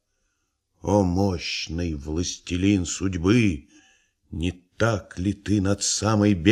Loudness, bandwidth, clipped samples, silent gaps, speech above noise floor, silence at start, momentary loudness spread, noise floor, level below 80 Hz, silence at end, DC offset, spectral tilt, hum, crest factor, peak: -24 LUFS; 12.5 kHz; under 0.1%; none; 51 dB; 0.85 s; 10 LU; -74 dBFS; -44 dBFS; 0 s; under 0.1%; -5 dB/octave; none; 20 dB; -4 dBFS